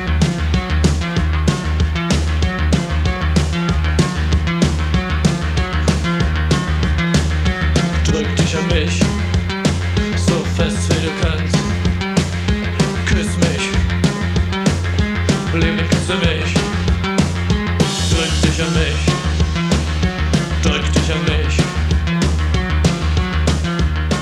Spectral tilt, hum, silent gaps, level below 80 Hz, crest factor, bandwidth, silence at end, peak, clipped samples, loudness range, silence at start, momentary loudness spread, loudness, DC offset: -5.5 dB/octave; none; none; -22 dBFS; 16 dB; 12 kHz; 0 s; 0 dBFS; under 0.1%; 1 LU; 0 s; 2 LU; -17 LUFS; under 0.1%